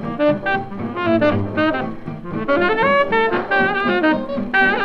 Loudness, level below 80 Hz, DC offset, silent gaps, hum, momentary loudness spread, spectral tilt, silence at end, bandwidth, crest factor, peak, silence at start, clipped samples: -18 LUFS; -44 dBFS; under 0.1%; none; none; 10 LU; -7.5 dB/octave; 0 s; 6.6 kHz; 16 dB; -2 dBFS; 0 s; under 0.1%